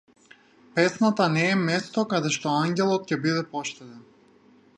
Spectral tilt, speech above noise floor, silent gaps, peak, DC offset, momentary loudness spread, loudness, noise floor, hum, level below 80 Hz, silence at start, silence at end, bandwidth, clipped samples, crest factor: -5 dB/octave; 32 dB; none; -6 dBFS; under 0.1%; 10 LU; -24 LUFS; -57 dBFS; none; -72 dBFS; 0.75 s; 0.75 s; 11 kHz; under 0.1%; 18 dB